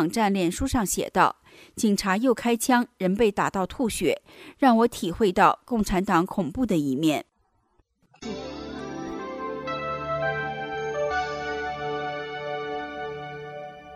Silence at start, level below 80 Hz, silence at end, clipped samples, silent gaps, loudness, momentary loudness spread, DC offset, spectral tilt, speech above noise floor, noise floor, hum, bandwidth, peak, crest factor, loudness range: 0 s; -48 dBFS; 0 s; under 0.1%; none; -25 LUFS; 14 LU; under 0.1%; -5 dB/octave; 45 dB; -68 dBFS; none; 15.5 kHz; -6 dBFS; 20 dB; 8 LU